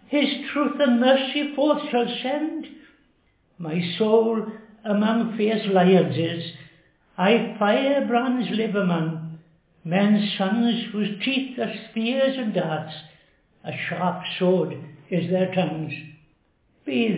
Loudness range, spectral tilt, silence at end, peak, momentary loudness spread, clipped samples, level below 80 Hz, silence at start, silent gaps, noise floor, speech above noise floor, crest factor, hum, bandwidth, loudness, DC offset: 4 LU; -10.5 dB/octave; 0 s; -6 dBFS; 15 LU; under 0.1%; -70 dBFS; 0.1 s; none; -64 dBFS; 42 dB; 18 dB; none; 4 kHz; -23 LUFS; under 0.1%